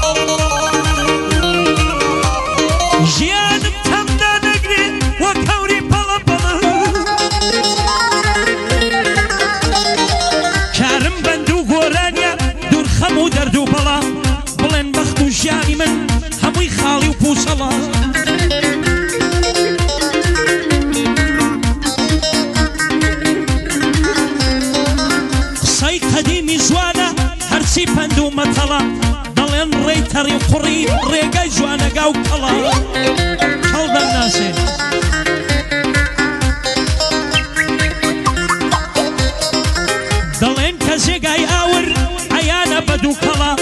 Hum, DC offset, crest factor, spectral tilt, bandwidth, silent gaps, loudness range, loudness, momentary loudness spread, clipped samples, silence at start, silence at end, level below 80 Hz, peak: none; under 0.1%; 14 dB; -4 dB/octave; 12.5 kHz; none; 2 LU; -14 LUFS; 3 LU; under 0.1%; 0 s; 0 s; -24 dBFS; 0 dBFS